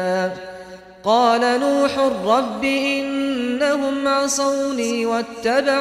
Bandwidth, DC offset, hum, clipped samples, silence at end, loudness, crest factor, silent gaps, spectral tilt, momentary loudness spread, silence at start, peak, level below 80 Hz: 15 kHz; under 0.1%; none; under 0.1%; 0 s; -19 LUFS; 16 dB; none; -3 dB/octave; 8 LU; 0 s; -4 dBFS; -56 dBFS